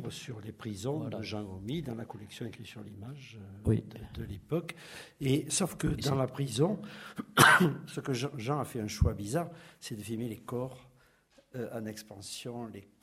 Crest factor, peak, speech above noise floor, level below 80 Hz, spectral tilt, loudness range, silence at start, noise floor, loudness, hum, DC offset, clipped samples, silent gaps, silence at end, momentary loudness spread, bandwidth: 28 dB; -6 dBFS; 32 dB; -50 dBFS; -4.5 dB/octave; 12 LU; 0 s; -65 dBFS; -32 LUFS; none; under 0.1%; under 0.1%; none; 0.2 s; 16 LU; 16 kHz